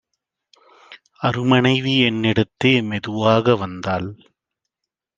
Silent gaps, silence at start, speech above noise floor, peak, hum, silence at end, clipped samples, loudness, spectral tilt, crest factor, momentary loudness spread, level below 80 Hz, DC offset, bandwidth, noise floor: none; 0.9 s; 65 dB; -2 dBFS; none; 1 s; under 0.1%; -18 LUFS; -6.5 dB/octave; 20 dB; 9 LU; -58 dBFS; under 0.1%; 7.6 kHz; -84 dBFS